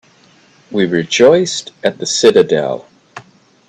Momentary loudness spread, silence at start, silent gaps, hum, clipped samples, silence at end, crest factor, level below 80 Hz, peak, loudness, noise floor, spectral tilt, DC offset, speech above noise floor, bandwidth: 12 LU; 0.7 s; none; none; under 0.1%; 0.5 s; 14 dB; -58 dBFS; 0 dBFS; -13 LUFS; -48 dBFS; -4 dB/octave; under 0.1%; 36 dB; 10 kHz